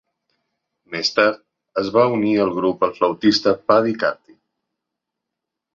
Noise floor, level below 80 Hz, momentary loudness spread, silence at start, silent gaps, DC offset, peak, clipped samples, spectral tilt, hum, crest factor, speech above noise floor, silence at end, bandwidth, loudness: -83 dBFS; -60 dBFS; 10 LU; 0.9 s; none; under 0.1%; -2 dBFS; under 0.1%; -5 dB/octave; none; 20 dB; 65 dB; 1.6 s; 7.6 kHz; -18 LUFS